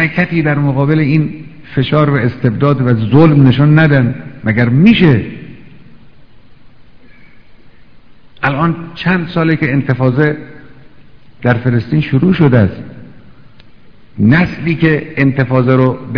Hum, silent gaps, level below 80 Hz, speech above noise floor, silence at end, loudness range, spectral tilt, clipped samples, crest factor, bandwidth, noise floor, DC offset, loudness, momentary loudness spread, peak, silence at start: none; none; -40 dBFS; 33 dB; 0 s; 8 LU; -10 dB/octave; 0.8%; 12 dB; 5.4 kHz; -43 dBFS; 1%; -12 LUFS; 10 LU; 0 dBFS; 0 s